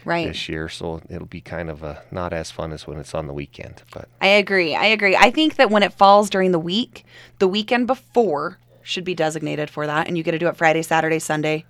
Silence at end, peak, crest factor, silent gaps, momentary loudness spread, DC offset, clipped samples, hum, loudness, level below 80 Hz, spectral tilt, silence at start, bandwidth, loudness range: 0.1 s; 0 dBFS; 20 dB; none; 18 LU; under 0.1%; under 0.1%; none; -19 LUFS; -48 dBFS; -4.5 dB/octave; 0.05 s; 15.5 kHz; 13 LU